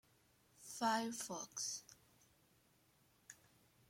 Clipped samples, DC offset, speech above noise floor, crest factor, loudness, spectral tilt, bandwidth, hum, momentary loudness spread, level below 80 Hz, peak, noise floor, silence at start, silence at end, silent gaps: under 0.1%; under 0.1%; 32 dB; 22 dB; -43 LUFS; -2 dB/octave; 16.5 kHz; none; 23 LU; -86 dBFS; -26 dBFS; -75 dBFS; 0.6 s; 0.55 s; none